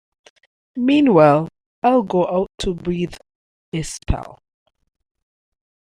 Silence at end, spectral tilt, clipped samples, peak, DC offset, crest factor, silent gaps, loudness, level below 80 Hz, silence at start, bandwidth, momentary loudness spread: 1.6 s; -6.5 dB/octave; under 0.1%; -2 dBFS; under 0.1%; 18 dB; 1.66-1.82 s, 3.35-3.72 s; -18 LUFS; -38 dBFS; 0.75 s; 12 kHz; 16 LU